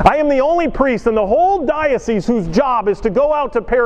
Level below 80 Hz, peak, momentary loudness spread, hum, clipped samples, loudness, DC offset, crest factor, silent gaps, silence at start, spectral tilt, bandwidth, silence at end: -32 dBFS; 0 dBFS; 3 LU; none; under 0.1%; -15 LUFS; under 0.1%; 14 dB; none; 0 s; -6.5 dB/octave; 9.6 kHz; 0 s